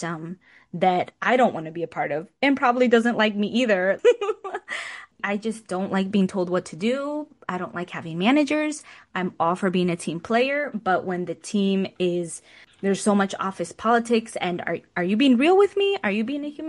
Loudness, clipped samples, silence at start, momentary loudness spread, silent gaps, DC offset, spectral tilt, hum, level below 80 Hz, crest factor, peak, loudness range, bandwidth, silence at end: -23 LUFS; under 0.1%; 0 s; 12 LU; none; under 0.1%; -5.5 dB/octave; none; -68 dBFS; 18 dB; -6 dBFS; 4 LU; 11.5 kHz; 0 s